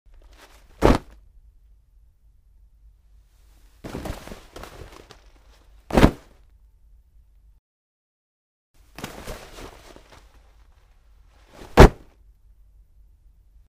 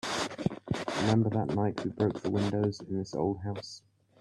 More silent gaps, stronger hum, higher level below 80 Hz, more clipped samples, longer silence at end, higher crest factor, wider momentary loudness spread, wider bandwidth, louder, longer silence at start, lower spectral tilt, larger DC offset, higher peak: first, 7.59-8.74 s vs none; neither; first, -30 dBFS vs -60 dBFS; neither; first, 1.85 s vs 0.4 s; first, 26 dB vs 18 dB; first, 29 LU vs 10 LU; first, 15.5 kHz vs 12 kHz; first, -19 LUFS vs -31 LUFS; first, 0.8 s vs 0.05 s; about the same, -6.5 dB/octave vs -6 dB/octave; neither; first, 0 dBFS vs -14 dBFS